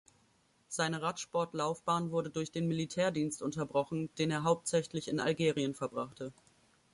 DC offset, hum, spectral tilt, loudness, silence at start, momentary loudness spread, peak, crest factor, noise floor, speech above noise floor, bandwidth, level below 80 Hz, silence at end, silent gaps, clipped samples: under 0.1%; none; -5 dB/octave; -35 LUFS; 0.7 s; 7 LU; -16 dBFS; 18 dB; -71 dBFS; 36 dB; 11.5 kHz; -70 dBFS; 0.6 s; none; under 0.1%